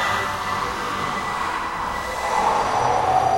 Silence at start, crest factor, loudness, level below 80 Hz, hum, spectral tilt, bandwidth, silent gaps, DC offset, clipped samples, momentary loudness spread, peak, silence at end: 0 s; 14 dB; -22 LUFS; -44 dBFS; none; -3.5 dB/octave; 16 kHz; none; under 0.1%; under 0.1%; 6 LU; -8 dBFS; 0 s